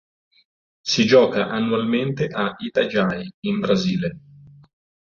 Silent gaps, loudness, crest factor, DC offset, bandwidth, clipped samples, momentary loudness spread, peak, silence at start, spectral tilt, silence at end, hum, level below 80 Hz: 3.34-3.42 s; -21 LUFS; 20 dB; under 0.1%; 7.4 kHz; under 0.1%; 11 LU; -2 dBFS; 0.85 s; -5.5 dB/octave; 0.85 s; none; -56 dBFS